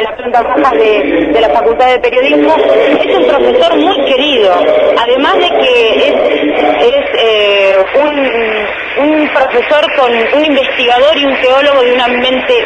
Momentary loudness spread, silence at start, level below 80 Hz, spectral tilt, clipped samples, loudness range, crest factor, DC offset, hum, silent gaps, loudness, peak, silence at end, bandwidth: 3 LU; 0 s; -40 dBFS; -4 dB/octave; 0.2%; 1 LU; 8 dB; under 0.1%; none; none; -8 LUFS; 0 dBFS; 0 s; 9.2 kHz